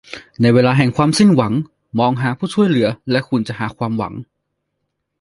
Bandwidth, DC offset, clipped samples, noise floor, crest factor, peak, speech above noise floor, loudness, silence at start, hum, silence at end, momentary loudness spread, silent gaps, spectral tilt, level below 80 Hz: 11.5 kHz; under 0.1%; under 0.1%; -74 dBFS; 16 dB; 0 dBFS; 58 dB; -16 LUFS; 0.1 s; none; 1 s; 11 LU; none; -6.5 dB/octave; -52 dBFS